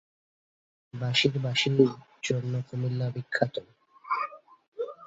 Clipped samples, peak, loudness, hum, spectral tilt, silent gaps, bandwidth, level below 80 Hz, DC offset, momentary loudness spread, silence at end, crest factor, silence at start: under 0.1%; -8 dBFS; -28 LUFS; none; -5.5 dB/octave; 4.68-4.72 s; 8 kHz; -68 dBFS; under 0.1%; 13 LU; 0 s; 22 dB; 0.95 s